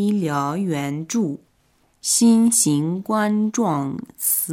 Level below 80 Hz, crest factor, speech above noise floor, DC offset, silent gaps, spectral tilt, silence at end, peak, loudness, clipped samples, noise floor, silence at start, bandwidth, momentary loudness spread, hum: -66 dBFS; 16 dB; 42 dB; under 0.1%; none; -4.5 dB/octave; 0 s; -4 dBFS; -20 LUFS; under 0.1%; -62 dBFS; 0 s; 17 kHz; 11 LU; none